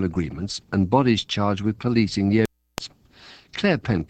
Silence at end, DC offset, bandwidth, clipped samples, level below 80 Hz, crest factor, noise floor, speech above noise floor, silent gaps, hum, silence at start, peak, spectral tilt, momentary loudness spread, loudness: 0.05 s; under 0.1%; 15 kHz; under 0.1%; -48 dBFS; 20 dB; -49 dBFS; 28 dB; none; none; 0 s; -4 dBFS; -6 dB/octave; 16 LU; -22 LUFS